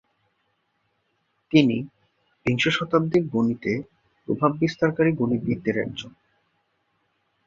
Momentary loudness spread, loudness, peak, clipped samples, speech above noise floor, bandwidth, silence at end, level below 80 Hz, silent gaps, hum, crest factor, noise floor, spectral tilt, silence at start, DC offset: 11 LU; -23 LUFS; -4 dBFS; under 0.1%; 50 dB; 7.6 kHz; 1.35 s; -58 dBFS; none; none; 22 dB; -72 dBFS; -6.5 dB/octave; 1.5 s; under 0.1%